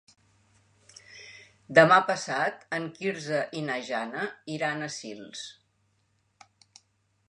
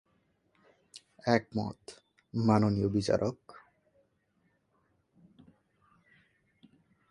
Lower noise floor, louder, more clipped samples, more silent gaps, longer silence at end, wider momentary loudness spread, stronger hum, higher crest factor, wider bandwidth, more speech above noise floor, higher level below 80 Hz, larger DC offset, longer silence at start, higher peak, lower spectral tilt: about the same, -71 dBFS vs -74 dBFS; first, -26 LUFS vs -30 LUFS; neither; neither; second, 1.75 s vs 3.6 s; about the same, 25 LU vs 26 LU; neither; about the same, 26 dB vs 24 dB; about the same, 10.5 kHz vs 11 kHz; about the same, 44 dB vs 45 dB; second, -78 dBFS vs -60 dBFS; neither; first, 1.1 s vs 0.95 s; first, -4 dBFS vs -10 dBFS; second, -4.5 dB/octave vs -7 dB/octave